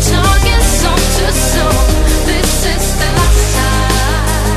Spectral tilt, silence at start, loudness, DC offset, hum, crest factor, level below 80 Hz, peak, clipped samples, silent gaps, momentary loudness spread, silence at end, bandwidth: -4 dB/octave; 0 s; -12 LUFS; 0.6%; none; 10 dB; -12 dBFS; 0 dBFS; under 0.1%; none; 3 LU; 0 s; 13.5 kHz